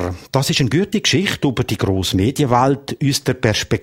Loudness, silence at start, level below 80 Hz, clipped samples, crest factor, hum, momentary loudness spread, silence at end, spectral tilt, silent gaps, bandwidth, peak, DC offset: -17 LUFS; 0 s; -42 dBFS; under 0.1%; 18 dB; none; 4 LU; 0 s; -5 dB/octave; none; 16.5 kHz; 0 dBFS; under 0.1%